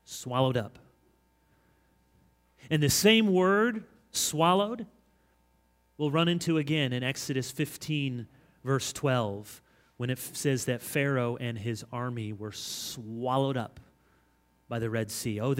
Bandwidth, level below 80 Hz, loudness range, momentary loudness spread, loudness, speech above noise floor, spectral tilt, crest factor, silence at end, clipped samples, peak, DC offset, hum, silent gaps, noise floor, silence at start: 16 kHz; -64 dBFS; 7 LU; 14 LU; -29 LUFS; 39 dB; -4.5 dB/octave; 24 dB; 0 s; under 0.1%; -8 dBFS; under 0.1%; none; none; -68 dBFS; 0.1 s